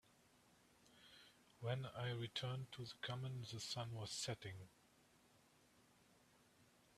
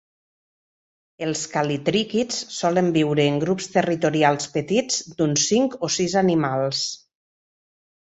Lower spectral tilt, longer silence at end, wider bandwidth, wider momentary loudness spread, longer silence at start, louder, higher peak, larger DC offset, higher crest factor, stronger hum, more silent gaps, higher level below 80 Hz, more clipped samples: about the same, -4 dB/octave vs -4 dB/octave; second, 0.3 s vs 1.05 s; first, 14 kHz vs 8.2 kHz; first, 19 LU vs 6 LU; second, 0.8 s vs 1.2 s; second, -48 LUFS vs -22 LUFS; second, -30 dBFS vs -4 dBFS; neither; about the same, 22 dB vs 20 dB; neither; neither; second, -80 dBFS vs -62 dBFS; neither